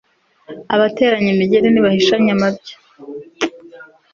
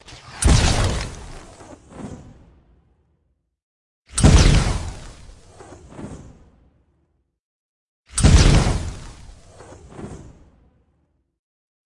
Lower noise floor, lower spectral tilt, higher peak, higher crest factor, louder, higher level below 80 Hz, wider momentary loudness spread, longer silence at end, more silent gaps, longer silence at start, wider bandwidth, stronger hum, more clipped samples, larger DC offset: second, -41 dBFS vs -69 dBFS; about the same, -6 dB/octave vs -5 dB/octave; about the same, -2 dBFS vs 0 dBFS; second, 14 dB vs 22 dB; first, -15 LUFS vs -18 LUFS; second, -54 dBFS vs -26 dBFS; second, 21 LU vs 27 LU; second, 0.3 s vs 1.85 s; second, none vs 3.63-4.05 s, 7.40-8.04 s; first, 0.5 s vs 0.1 s; second, 7.4 kHz vs 11.5 kHz; neither; neither; neither